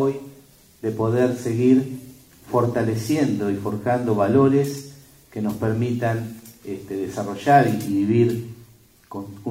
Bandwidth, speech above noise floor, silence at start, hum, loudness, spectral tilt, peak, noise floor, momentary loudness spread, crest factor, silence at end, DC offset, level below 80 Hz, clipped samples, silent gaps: 16 kHz; 30 dB; 0 s; none; -21 LUFS; -7.5 dB/octave; -4 dBFS; -51 dBFS; 18 LU; 18 dB; 0 s; under 0.1%; -58 dBFS; under 0.1%; none